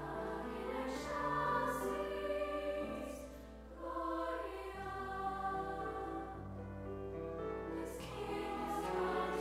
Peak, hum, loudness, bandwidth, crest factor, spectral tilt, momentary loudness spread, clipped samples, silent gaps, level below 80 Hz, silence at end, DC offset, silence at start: -24 dBFS; none; -41 LUFS; 16 kHz; 16 dB; -5.5 dB/octave; 10 LU; under 0.1%; none; -56 dBFS; 0 s; under 0.1%; 0 s